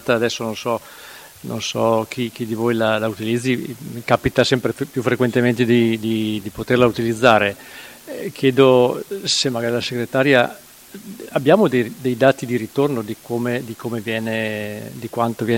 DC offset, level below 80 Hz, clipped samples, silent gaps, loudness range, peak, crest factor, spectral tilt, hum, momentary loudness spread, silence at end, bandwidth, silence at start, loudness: under 0.1%; -52 dBFS; under 0.1%; none; 4 LU; 0 dBFS; 20 dB; -5 dB/octave; none; 15 LU; 0 s; 17 kHz; 0 s; -19 LUFS